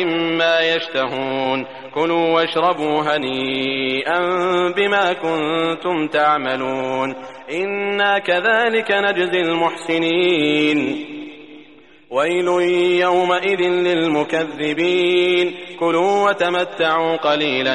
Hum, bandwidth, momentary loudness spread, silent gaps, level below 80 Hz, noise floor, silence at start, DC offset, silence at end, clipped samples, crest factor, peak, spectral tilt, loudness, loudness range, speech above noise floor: none; 11 kHz; 6 LU; none; -64 dBFS; -46 dBFS; 0 s; 0.2%; 0 s; under 0.1%; 14 dB; -4 dBFS; -5 dB/octave; -18 LUFS; 2 LU; 28 dB